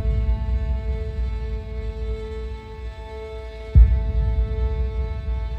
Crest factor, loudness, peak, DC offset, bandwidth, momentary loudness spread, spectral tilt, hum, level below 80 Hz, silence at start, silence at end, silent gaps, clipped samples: 18 dB; -25 LUFS; -2 dBFS; under 0.1%; 4.8 kHz; 17 LU; -9 dB/octave; none; -22 dBFS; 0 s; 0 s; none; under 0.1%